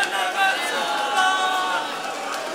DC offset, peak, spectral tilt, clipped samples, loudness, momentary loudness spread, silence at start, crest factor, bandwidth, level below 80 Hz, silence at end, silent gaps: under 0.1%; -6 dBFS; 0 dB/octave; under 0.1%; -22 LUFS; 8 LU; 0 s; 16 dB; 16 kHz; -78 dBFS; 0 s; none